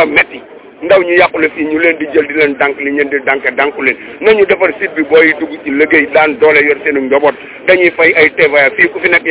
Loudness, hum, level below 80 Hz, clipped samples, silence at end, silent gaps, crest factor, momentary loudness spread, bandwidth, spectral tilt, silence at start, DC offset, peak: -9 LUFS; none; -50 dBFS; 2%; 0 s; none; 10 dB; 7 LU; 4 kHz; -7.5 dB/octave; 0 s; under 0.1%; 0 dBFS